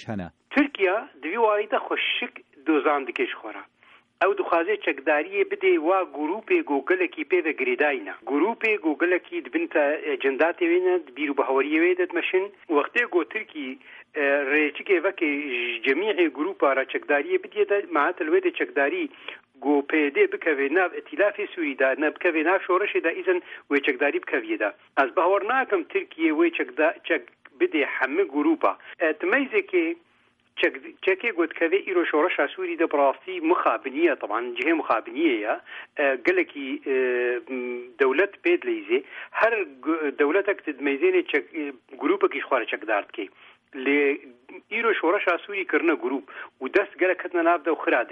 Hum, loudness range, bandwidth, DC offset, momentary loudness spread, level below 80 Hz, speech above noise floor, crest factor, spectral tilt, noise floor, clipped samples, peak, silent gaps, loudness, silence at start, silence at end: none; 2 LU; 5 kHz; under 0.1%; 8 LU; -74 dBFS; 40 dB; 16 dB; -6 dB/octave; -64 dBFS; under 0.1%; -8 dBFS; none; -24 LUFS; 0 s; 0.05 s